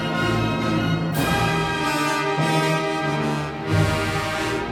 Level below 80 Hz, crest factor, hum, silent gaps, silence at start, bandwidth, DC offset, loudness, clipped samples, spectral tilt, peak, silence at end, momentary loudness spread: -42 dBFS; 14 dB; none; none; 0 s; 17.5 kHz; under 0.1%; -22 LUFS; under 0.1%; -5.5 dB/octave; -8 dBFS; 0 s; 3 LU